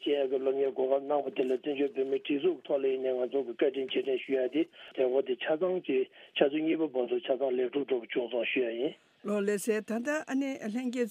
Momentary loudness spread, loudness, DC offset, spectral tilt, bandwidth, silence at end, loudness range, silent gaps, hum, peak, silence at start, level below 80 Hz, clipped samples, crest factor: 4 LU; -31 LUFS; under 0.1%; -5 dB/octave; 15 kHz; 0 s; 1 LU; none; none; -12 dBFS; 0 s; -88 dBFS; under 0.1%; 20 dB